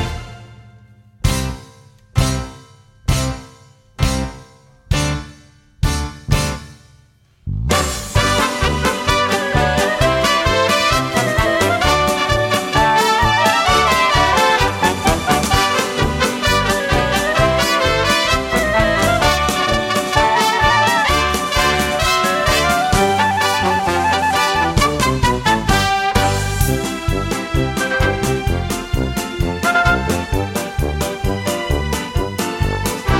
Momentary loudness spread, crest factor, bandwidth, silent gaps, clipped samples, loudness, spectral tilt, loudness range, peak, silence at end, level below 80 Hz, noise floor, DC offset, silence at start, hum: 8 LU; 16 dB; 16.5 kHz; none; under 0.1%; -16 LUFS; -4 dB/octave; 9 LU; 0 dBFS; 0 s; -26 dBFS; -52 dBFS; under 0.1%; 0 s; none